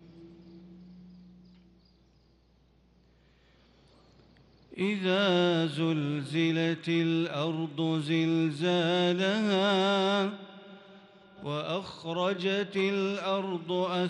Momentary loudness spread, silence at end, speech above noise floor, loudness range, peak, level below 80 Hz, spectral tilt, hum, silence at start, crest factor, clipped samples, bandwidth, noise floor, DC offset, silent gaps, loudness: 10 LU; 0 s; 36 dB; 5 LU; -14 dBFS; -70 dBFS; -6 dB/octave; none; 0.05 s; 16 dB; under 0.1%; 11 kHz; -64 dBFS; under 0.1%; none; -29 LUFS